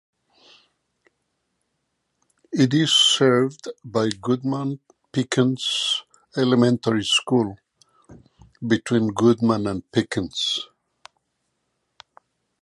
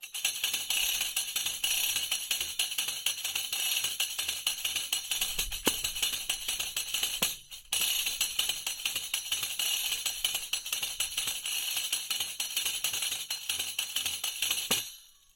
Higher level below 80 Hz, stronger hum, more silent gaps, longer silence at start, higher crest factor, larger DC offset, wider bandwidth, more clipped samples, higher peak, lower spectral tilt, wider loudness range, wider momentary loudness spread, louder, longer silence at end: about the same, -58 dBFS vs -56 dBFS; neither; neither; first, 2.5 s vs 0 s; about the same, 18 dB vs 22 dB; neither; second, 11.5 kHz vs 17 kHz; neither; first, -4 dBFS vs -12 dBFS; first, -4.5 dB/octave vs 1.5 dB/octave; about the same, 3 LU vs 1 LU; first, 13 LU vs 4 LU; first, -21 LUFS vs -30 LUFS; first, 2 s vs 0.3 s